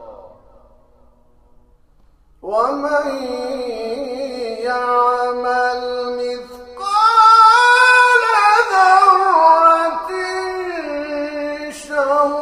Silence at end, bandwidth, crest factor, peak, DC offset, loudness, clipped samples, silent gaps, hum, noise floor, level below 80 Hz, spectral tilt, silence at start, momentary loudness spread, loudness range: 0 s; 15 kHz; 16 dB; 0 dBFS; under 0.1%; -14 LUFS; under 0.1%; none; none; -51 dBFS; -54 dBFS; -1.5 dB/octave; 0 s; 15 LU; 13 LU